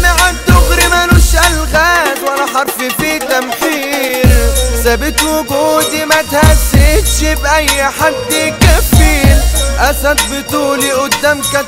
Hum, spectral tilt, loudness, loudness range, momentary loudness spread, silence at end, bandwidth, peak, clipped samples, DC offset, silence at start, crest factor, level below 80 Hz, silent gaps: none; -4 dB/octave; -10 LUFS; 2 LU; 6 LU; 0 s; 16.5 kHz; 0 dBFS; 0.2%; under 0.1%; 0 s; 10 dB; -14 dBFS; none